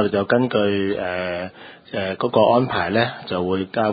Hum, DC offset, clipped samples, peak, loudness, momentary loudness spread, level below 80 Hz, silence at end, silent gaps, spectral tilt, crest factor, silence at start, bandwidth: none; under 0.1%; under 0.1%; -2 dBFS; -21 LUFS; 10 LU; -50 dBFS; 0 s; none; -11 dB/octave; 18 dB; 0 s; 5 kHz